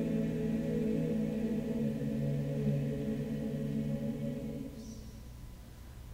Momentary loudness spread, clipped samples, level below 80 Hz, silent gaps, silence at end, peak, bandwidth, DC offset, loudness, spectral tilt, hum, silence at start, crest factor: 17 LU; under 0.1%; -52 dBFS; none; 0 s; -22 dBFS; 16 kHz; under 0.1%; -35 LUFS; -8.5 dB/octave; none; 0 s; 14 dB